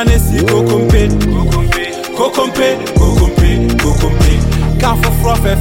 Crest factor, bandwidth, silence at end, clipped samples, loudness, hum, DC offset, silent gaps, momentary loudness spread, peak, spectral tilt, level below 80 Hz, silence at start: 10 dB; 17 kHz; 0 s; under 0.1%; -12 LUFS; none; under 0.1%; none; 3 LU; 0 dBFS; -6 dB/octave; -14 dBFS; 0 s